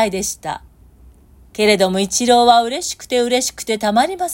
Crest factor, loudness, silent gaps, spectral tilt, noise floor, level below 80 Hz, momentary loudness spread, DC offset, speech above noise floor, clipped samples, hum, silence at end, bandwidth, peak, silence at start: 16 dB; -16 LUFS; none; -3 dB/octave; -46 dBFS; -48 dBFS; 14 LU; under 0.1%; 29 dB; under 0.1%; none; 0 s; 16.5 kHz; 0 dBFS; 0 s